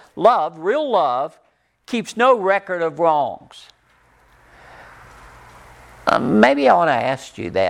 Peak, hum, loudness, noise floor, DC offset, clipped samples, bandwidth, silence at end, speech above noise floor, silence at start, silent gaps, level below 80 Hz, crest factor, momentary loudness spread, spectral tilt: -2 dBFS; none; -18 LUFS; -56 dBFS; under 0.1%; under 0.1%; 12.5 kHz; 0 s; 39 dB; 0.15 s; none; -56 dBFS; 18 dB; 12 LU; -5.5 dB/octave